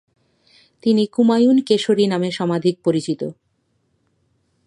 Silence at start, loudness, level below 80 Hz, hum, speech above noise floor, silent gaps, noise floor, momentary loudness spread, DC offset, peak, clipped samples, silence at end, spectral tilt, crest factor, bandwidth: 0.85 s; -18 LUFS; -68 dBFS; none; 50 dB; none; -67 dBFS; 10 LU; under 0.1%; -4 dBFS; under 0.1%; 1.35 s; -6.5 dB/octave; 16 dB; 11 kHz